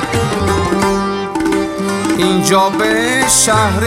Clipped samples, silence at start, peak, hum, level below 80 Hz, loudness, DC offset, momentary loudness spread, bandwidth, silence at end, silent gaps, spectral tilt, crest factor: under 0.1%; 0 s; 0 dBFS; none; -36 dBFS; -13 LUFS; under 0.1%; 8 LU; 16.5 kHz; 0 s; none; -3.5 dB/octave; 14 dB